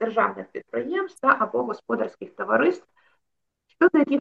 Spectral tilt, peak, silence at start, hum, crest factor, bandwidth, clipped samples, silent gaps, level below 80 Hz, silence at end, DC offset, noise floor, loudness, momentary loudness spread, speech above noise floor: -6.5 dB/octave; -4 dBFS; 0 s; none; 20 dB; 10.5 kHz; under 0.1%; none; -76 dBFS; 0 s; under 0.1%; -79 dBFS; -24 LUFS; 12 LU; 56 dB